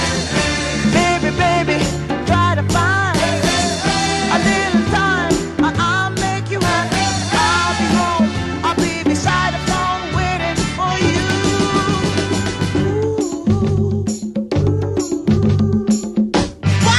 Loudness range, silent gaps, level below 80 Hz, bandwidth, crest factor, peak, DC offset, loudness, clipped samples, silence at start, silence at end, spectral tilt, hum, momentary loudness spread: 2 LU; none; -34 dBFS; 12.5 kHz; 14 dB; -2 dBFS; under 0.1%; -17 LUFS; under 0.1%; 0 s; 0 s; -4.5 dB/octave; none; 4 LU